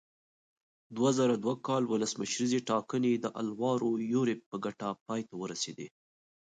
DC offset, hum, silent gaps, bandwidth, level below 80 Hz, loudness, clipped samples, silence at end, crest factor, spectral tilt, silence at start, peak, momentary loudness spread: under 0.1%; none; 4.46-4.52 s, 5.01-5.06 s; 9.4 kHz; -78 dBFS; -32 LUFS; under 0.1%; 0.6 s; 16 dB; -5 dB/octave; 0.9 s; -16 dBFS; 10 LU